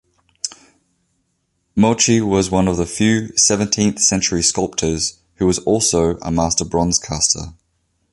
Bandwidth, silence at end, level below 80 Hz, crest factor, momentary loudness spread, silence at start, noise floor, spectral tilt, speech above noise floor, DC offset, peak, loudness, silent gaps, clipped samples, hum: 11.5 kHz; 0.6 s; -38 dBFS; 18 dB; 9 LU; 0.45 s; -68 dBFS; -3.5 dB/octave; 52 dB; under 0.1%; 0 dBFS; -16 LUFS; none; under 0.1%; none